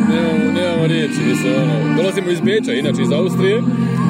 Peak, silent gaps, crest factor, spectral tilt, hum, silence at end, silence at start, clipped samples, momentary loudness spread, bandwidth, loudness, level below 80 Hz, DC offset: -4 dBFS; none; 12 dB; -6.5 dB/octave; none; 0 s; 0 s; under 0.1%; 2 LU; 15.5 kHz; -16 LUFS; -60 dBFS; under 0.1%